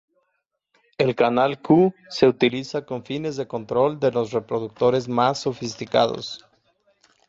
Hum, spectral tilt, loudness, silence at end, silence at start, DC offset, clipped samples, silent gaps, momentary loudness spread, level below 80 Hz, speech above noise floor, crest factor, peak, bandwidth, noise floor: none; -6 dB/octave; -22 LUFS; 0.9 s; 1 s; under 0.1%; under 0.1%; none; 12 LU; -62 dBFS; 54 dB; 18 dB; -4 dBFS; 7.8 kHz; -75 dBFS